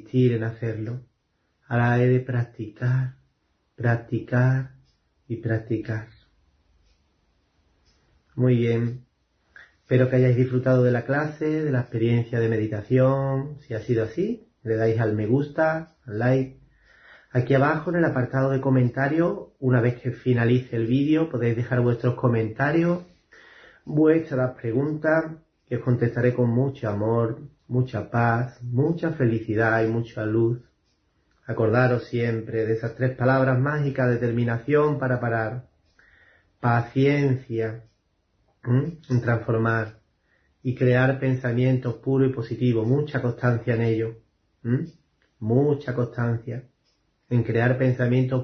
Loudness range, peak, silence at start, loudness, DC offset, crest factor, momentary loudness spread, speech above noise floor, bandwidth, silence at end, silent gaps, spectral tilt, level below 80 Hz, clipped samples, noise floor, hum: 5 LU; -6 dBFS; 0.15 s; -24 LUFS; under 0.1%; 18 dB; 10 LU; 49 dB; 6.2 kHz; 0 s; none; -9.5 dB/octave; -58 dBFS; under 0.1%; -71 dBFS; none